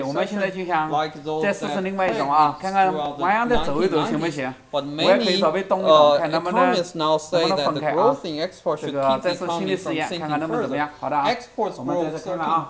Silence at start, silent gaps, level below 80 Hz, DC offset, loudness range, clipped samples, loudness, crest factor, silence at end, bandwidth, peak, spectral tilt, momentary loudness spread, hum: 0 s; none; -50 dBFS; under 0.1%; 5 LU; under 0.1%; -22 LUFS; 20 dB; 0 s; 8 kHz; -2 dBFS; -5 dB/octave; 8 LU; none